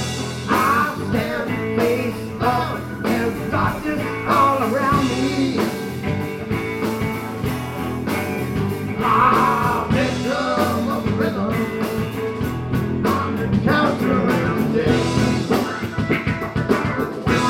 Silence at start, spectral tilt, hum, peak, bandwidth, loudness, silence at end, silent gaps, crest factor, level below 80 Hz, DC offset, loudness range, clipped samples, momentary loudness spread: 0 s; -6 dB/octave; none; -2 dBFS; 16.5 kHz; -20 LUFS; 0 s; none; 18 dB; -40 dBFS; under 0.1%; 3 LU; under 0.1%; 8 LU